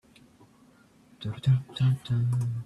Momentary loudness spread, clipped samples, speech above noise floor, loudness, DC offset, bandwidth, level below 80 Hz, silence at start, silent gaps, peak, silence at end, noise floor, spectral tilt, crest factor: 10 LU; under 0.1%; 33 dB; -28 LUFS; under 0.1%; 11 kHz; -58 dBFS; 1.2 s; none; -14 dBFS; 0 s; -59 dBFS; -7.5 dB/octave; 16 dB